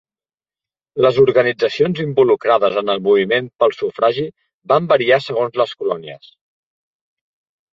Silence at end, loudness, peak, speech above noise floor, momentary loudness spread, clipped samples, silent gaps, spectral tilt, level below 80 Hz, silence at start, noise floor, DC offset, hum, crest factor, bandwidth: 1.55 s; -16 LUFS; -2 dBFS; over 74 dB; 10 LU; under 0.1%; 4.54-4.60 s; -6.5 dB/octave; -60 dBFS; 0.95 s; under -90 dBFS; under 0.1%; none; 16 dB; 7.2 kHz